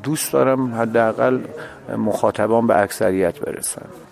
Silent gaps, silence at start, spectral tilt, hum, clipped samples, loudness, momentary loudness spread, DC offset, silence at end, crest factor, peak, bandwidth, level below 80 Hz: none; 0 s; -5 dB/octave; none; under 0.1%; -19 LUFS; 10 LU; under 0.1%; 0.05 s; 18 dB; -2 dBFS; 16 kHz; -52 dBFS